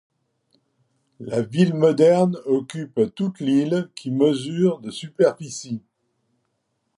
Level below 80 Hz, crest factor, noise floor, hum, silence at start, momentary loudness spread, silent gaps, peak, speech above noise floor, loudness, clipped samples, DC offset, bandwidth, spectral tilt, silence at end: -68 dBFS; 18 dB; -73 dBFS; none; 1.2 s; 15 LU; none; -4 dBFS; 53 dB; -21 LUFS; under 0.1%; under 0.1%; 11.5 kHz; -7 dB/octave; 1.2 s